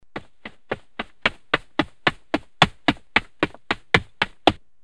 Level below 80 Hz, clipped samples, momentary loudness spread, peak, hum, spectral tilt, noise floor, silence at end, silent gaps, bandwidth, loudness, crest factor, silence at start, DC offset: -44 dBFS; under 0.1%; 15 LU; 0 dBFS; none; -4.5 dB/octave; -45 dBFS; 0.3 s; none; 12.5 kHz; -23 LUFS; 26 dB; 0.15 s; 0.5%